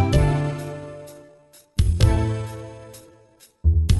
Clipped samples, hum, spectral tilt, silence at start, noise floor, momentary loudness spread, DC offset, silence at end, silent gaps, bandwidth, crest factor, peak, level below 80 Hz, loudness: under 0.1%; none; -6.5 dB/octave; 0 s; -54 dBFS; 21 LU; under 0.1%; 0 s; none; 12.5 kHz; 18 dB; -4 dBFS; -26 dBFS; -23 LUFS